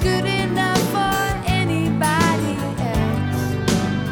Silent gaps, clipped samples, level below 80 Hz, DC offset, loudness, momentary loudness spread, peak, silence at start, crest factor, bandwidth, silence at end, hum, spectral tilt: none; under 0.1%; -34 dBFS; under 0.1%; -20 LUFS; 4 LU; -4 dBFS; 0 s; 14 dB; over 20 kHz; 0 s; none; -5 dB/octave